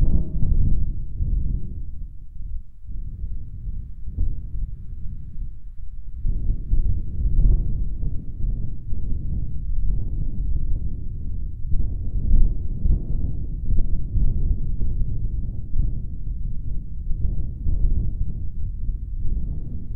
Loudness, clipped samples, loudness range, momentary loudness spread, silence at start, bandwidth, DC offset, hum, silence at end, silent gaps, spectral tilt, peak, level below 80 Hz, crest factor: -29 LUFS; under 0.1%; 8 LU; 13 LU; 0 s; 0.8 kHz; under 0.1%; none; 0 s; none; -13.5 dB/octave; -4 dBFS; -22 dBFS; 16 dB